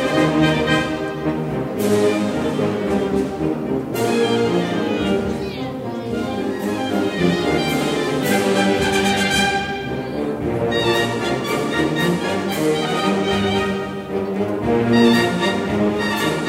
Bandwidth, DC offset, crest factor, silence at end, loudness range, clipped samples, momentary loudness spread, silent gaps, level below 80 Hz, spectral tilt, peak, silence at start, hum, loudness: 16 kHz; under 0.1%; 16 dB; 0 s; 3 LU; under 0.1%; 7 LU; none; -44 dBFS; -5 dB/octave; -2 dBFS; 0 s; none; -19 LUFS